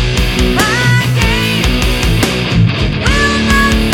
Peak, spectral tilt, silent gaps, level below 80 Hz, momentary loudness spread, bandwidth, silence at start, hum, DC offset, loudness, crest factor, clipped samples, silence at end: 0 dBFS; -4.5 dB/octave; none; -18 dBFS; 3 LU; 18 kHz; 0 s; none; under 0.1%; -11 LUFS; 12 dB; under 0.1%; 0 s